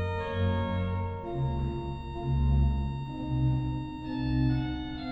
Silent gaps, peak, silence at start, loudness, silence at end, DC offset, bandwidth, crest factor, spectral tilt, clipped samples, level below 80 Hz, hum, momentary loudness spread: none; -16 dBFS; 0 s; -31 LUFS; 0 s; under 0.1%; 5.6 kHz; 14 dB; -9.5 dB/octave; under 0.1%; -34 dBFS; none; 8 LU